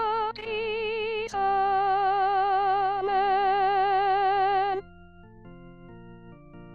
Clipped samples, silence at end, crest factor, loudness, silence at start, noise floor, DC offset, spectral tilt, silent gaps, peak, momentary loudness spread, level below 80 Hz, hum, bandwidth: under 0.1%; 0 s; 12 dB; -25 LUFS; 0 s; -49 dBFS; 0.2%; -5 dB/octave; none; -14 dBFS; 6 LU; -56 dBFS; none; 7 kHz